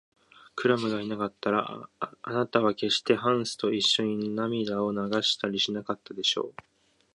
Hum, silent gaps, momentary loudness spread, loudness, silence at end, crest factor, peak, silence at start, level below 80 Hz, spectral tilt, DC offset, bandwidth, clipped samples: none; none; 11 LU; -27 LUFS; 0.65 s; 22 dB; -6 dBFS; 0.55 s; -70 dBFS; -4 dB/octave; under 0.1%; 11.5 kHz; under 0.1%